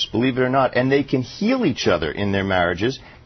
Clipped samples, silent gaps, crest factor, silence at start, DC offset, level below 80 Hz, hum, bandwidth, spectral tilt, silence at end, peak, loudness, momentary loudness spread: under 0.1%; none; 14 dB; 0 s; under 0.1%; -46 dBFS; none; 6.4 kHz; -6 dB/octave; 0.1 s; -6 dBFS; -20 LUFS; 4 LU